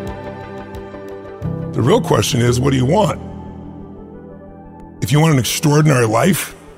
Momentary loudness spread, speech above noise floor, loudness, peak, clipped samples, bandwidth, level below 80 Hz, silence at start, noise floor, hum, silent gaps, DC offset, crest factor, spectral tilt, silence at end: 22 LU; 22 dB; -15 LUFS; -2 dBFS; under 0.1%; 16 kHz; -40 dBFS; 0 s; -36 dBFS; none; none; under 0.1%; 16 dB; -5.5 dB/octave; 0.05 s